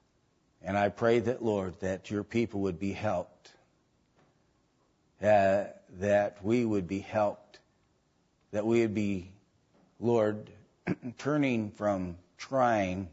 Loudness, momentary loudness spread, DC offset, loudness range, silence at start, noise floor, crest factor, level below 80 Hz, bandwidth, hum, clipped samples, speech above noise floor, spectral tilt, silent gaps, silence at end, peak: -30 LUFS; 11 LU; under 0.1%; 5 LU; 0.65 s; -71 dBFS; 18 dB; -66 dBFS; 8 kHz; none; under 0.1%; 42 dB; -7 dB/octave; none; 0.05 s; -14 dBFS